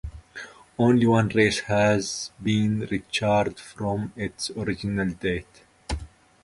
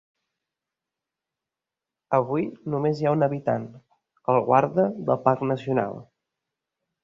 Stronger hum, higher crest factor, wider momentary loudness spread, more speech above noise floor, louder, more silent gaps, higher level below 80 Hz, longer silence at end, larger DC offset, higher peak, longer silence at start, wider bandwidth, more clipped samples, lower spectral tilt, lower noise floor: neither; about the same, 20 dB vs 22 dB; first, 16 LU vs 10 LU; second, 19 dB vs 65 dB; about the same, -25 LUFS vs -24 LUFS; neither; first, -44 dBFS vs -66 dBFS; second, 0.4 s vs 1 s; neither; about the same, -6 dBFS vs -4 dBFS; second, 0.05 s vs 2.1 s; first, 11.5 kHz vs 7.4 kHz; neither; second, -5.5 dB/octave vs -9 dB/octave; second, -43 dBFS vs -88 dBFS